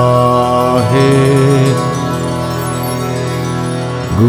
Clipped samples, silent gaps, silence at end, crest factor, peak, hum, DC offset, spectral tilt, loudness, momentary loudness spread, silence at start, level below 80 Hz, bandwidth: under 0.1%; none; 0 s; 12 dB; 0 dBFS; none; under 0.1%; -6.5 dB/octave; -13 LUFS; 8 LU; 0 s; -36 dBFS; over 20 kHz